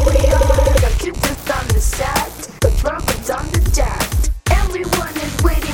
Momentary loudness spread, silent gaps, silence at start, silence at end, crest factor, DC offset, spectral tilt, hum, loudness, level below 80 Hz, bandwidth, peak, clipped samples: 7 LU; none; 0 s; 0 s; 14 dB; under 0.1%; -4.5 dB/octave; none; -17 LUFS; -18 dBFS; 17.5 kHz; 0 dBFS; under 0.1%